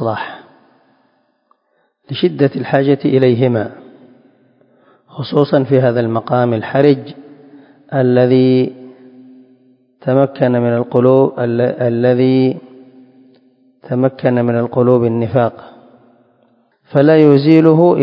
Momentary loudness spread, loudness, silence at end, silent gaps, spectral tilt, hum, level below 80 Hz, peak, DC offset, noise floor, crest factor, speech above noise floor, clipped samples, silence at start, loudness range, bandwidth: 12 LU; -13 LUFS; 0 s; none; -10.5 dB/octave; none; -58 dBFS; 0 dBFS; under 0.1%; -62 dBFS; 14 dB; 50 dB; 0.1%; 0 s; 3 LU; 5.4 kHz